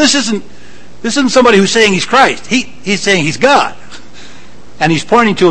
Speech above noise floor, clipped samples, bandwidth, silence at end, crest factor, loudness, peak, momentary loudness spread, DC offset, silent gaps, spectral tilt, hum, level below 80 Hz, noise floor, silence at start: 27 dB; 0.7%; 11 kHz; 0 s; 12 dB; -10 LUFS; 0 dBFS; 9 LU; 5%; none; -3.5 dB/octave; none; -44 dBFS; -38 dBFS; 0 s